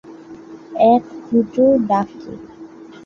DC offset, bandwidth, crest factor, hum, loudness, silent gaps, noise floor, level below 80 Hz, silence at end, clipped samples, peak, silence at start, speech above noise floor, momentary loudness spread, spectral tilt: under 0.1%; 6.8 kHz; 16 dB; none; -16 LUFS; none; -38 dBFS; -56 dBFS; 0.2 s; under 0.1%; -2 dBFS; 0.1 s; 22 dB; 24 LU; -8.5 dB/octave